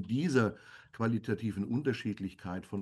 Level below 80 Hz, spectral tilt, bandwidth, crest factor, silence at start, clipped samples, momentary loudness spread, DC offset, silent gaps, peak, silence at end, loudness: -66 dBFS; -7 dB/octave; 12.5 kHz; 20 dB; 0 s; under 0.1%; 11 LU; under 0.1%; none; -14 dBFS; 0 s; -34 LUFS